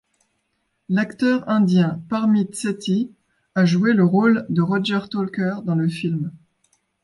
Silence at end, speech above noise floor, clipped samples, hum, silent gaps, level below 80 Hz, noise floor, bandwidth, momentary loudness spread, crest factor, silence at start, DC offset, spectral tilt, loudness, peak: 0.65 s; 52 dB; under 0.1%; none; none; -64 dBFS; -72 dBFS; 11.5 kHz; 9 LU; 14 dB; 0.9 s; under 0.1%; -7 dB/octave; -20 LUFS; -6 dBFS